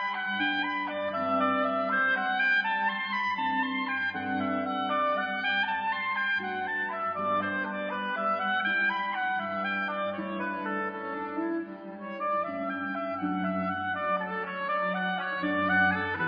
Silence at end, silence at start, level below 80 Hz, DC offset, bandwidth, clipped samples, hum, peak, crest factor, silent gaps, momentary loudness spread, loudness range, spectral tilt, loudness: 0 s; 0 s; -76 dBFS; under 0.1%; 5.4 kHz; under 0.1%; none; -14 dBFS; 14 dB; none; 7 LU; 5 LU; -7 dB/octave; -29 LUFS